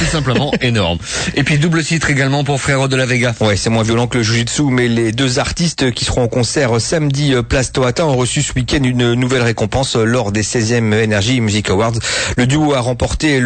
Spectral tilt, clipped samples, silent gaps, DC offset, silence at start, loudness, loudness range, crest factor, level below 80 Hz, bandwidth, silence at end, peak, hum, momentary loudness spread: -4.5 dB/octave; under 0.1%; none; under 0.1%; 0 s; -14 LUFS; 1 LU; 10 dB; -32 dBFS; 9.2 kHz; 0 s; -4 dBFS; none; 2 LU